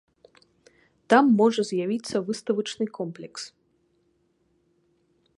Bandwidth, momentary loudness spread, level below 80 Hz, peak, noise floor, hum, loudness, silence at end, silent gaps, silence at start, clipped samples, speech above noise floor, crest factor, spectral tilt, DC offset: 11.5 kHz; 18 LU; -74 dBFS; -4 dBFS; -69 dBFS; none; -24 LUFS; 1.9 s; none; 1.1 s; under 0.1%; 45 dB; 24 dB; -5 dB/octave; under 0.1%